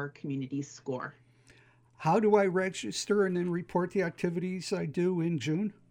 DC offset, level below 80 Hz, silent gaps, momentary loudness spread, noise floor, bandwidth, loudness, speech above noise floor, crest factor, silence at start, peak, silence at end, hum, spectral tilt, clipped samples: under 0.1%; -72 dBFS; none; 12 LU; -61 dBFS; 15.5 kHz; -31 LUFS; 31 dB; 20 dB; 0 s; -10 dBFS; 0.2 s; none; -6 dB/octave; under 0.1%